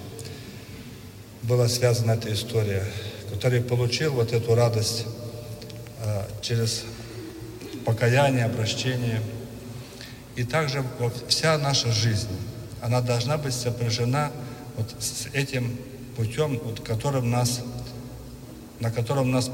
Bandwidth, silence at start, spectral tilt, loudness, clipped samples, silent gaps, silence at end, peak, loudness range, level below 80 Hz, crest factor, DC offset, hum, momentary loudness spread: 16.5 kHz; 0 s; -5 dB/octave; -25 LUFS; under 0.1%; none; 0 s; -6 dBFS; 4 LU; -50 dBFS; 20 dB; under 0.1%; none; 17 LU